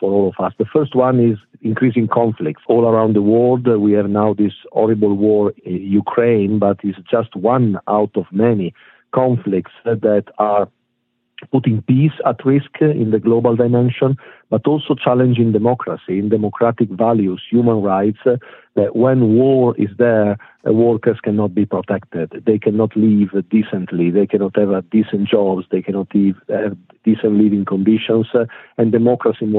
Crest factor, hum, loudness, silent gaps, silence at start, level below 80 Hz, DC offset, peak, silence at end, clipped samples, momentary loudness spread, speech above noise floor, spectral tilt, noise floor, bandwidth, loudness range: 14 dB; none; -16 LUFS; none; 0 s; -62 dBFS; under 0.1%; -2 dBFS; 0 s; under 0.1%; 7 LU; 54 dB; -11.5 dB/octave; -69 dBFS; 4 kHz; 2 LU